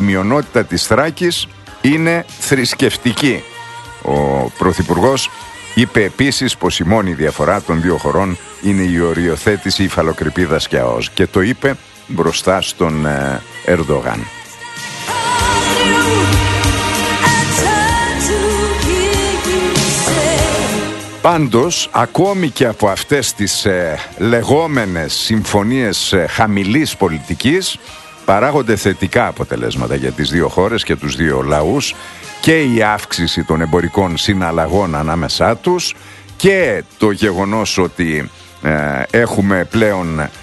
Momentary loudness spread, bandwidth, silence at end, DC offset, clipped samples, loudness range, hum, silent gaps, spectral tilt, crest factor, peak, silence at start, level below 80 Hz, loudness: 7 LU; 12.5 kHz; 0 s; under 0.1%; under 0.1%; 2 LU; none; none; -4.5 dB/octave; 14 dB; 0 dBFS; 0 s; -32 dBFS; -14 LUFS